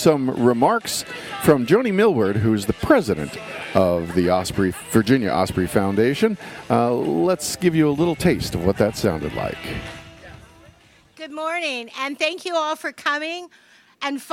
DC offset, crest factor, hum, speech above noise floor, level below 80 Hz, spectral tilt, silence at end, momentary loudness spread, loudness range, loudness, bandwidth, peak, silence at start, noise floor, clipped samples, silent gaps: under 0.1%; 18 dB; none; 32 dB; -46 dBFS; -5.5 dB/octave; 0 s; 12 LU; 7 LU; -21 LUFS; 16.5 kHz; -2 dBFS; 0 s; -52 dBFS; under 0.1%; none